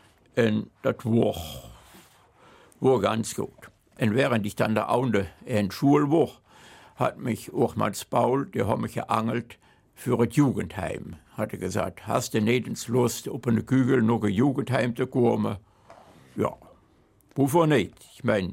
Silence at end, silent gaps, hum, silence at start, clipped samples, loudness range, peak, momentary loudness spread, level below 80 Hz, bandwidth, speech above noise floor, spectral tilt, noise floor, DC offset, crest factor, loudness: 0 s; none; none; 0.35 s; under 0.1%; 3 LU; -8 dBFS; 11 LU; -58 dBFS; 16.5 kHz; 36 dB; -6.5 dB/octave; -61 dBFS; under 0.1%; 18 dB; -26 LUFS